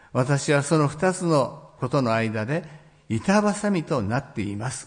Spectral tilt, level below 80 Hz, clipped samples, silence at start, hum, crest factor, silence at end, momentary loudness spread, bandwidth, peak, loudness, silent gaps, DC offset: -6 dB/octave; -58 dBFS; under 0.1%; 0.15 s; none; 16 dB; 0 s; 9 LU; 10.5 kHz; -8 dBFS; -24 LUFS; none; under 0.1%